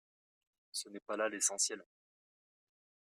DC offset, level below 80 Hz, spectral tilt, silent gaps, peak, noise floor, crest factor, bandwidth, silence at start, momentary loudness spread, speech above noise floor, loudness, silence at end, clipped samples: under 0.1%; under -90 dBFS; 0 dB/octave; 1.02-1.06 s; -20 dBFS; under -90 dBFS; 22 dB; 15 kHz; 0.75 s; 12 LU; over 52 dB; -36 LUFS; 1.25 s; under 0.1%